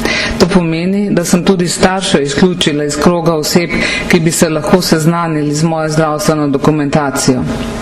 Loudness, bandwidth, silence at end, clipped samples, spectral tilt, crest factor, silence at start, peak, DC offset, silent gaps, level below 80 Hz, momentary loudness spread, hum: -12 LUFS; 14.5 kHz; 0 s; 0.1%; -5 dB/octave; 12 dB; 0 s; 0 dBFS; under 0.1%; none; -32 dBFS; 3 LU; none